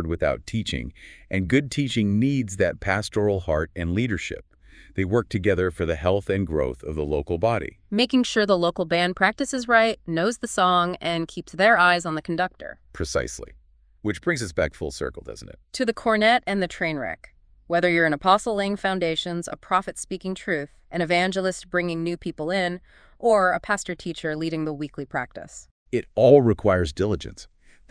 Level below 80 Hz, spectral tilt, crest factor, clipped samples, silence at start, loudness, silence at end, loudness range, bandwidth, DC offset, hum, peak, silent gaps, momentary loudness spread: -44 dBFS; -5 dB/octave; 20 dB; under 0.1%; 0 s; -23 LUFS; 0.45 s; 5 LU; 11 kHz; under 0.1%; none; -4 dBFS; 25.71-25.86 s; 13 LU